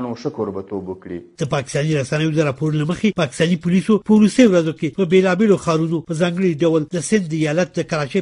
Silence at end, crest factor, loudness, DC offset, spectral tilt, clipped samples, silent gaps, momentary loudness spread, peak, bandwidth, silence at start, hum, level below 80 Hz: 0 s; 16 dB; -18 LUFS; under 0.1%; -6.5 dB/octave; under 0.1%; none; 12 LU; 0 dBFS; 11 kHz; 0 s; none; -52 dBFS